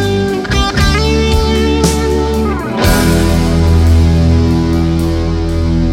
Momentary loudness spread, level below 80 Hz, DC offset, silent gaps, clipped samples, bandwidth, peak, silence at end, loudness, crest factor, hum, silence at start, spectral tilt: 5 LU; -16 dBFS; under 0.1%; none; under 0.1%; 16.5 kHz; 0 dBFS; 0 s; -12 LUFS; 10 dB; none; 0 s; -6 dB/octave